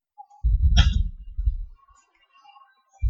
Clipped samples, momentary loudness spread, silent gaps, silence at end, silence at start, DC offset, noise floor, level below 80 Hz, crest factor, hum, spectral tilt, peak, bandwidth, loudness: under 0.1%; 16 LU; none; 0 s; 0.2 s; under 0.1%; -60 dBFS; -24 dBFS; 22 dB; none; -5 dB/octave; -4 dBFS; 7.2 kHz; -24 LUFS